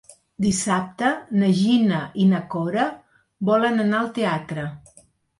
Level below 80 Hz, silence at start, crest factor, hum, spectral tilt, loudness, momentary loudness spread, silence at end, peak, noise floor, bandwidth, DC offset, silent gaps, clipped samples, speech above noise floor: -56 dBFS; 0.1 s; 14 dB; none; -5.5 dB/octave; -22 LUFS; 8 LU; 0.6 s; -8 dBFS; -55 dBFS; 11.5 kHz; under 0.1%; none; under 0.1%; 35 dB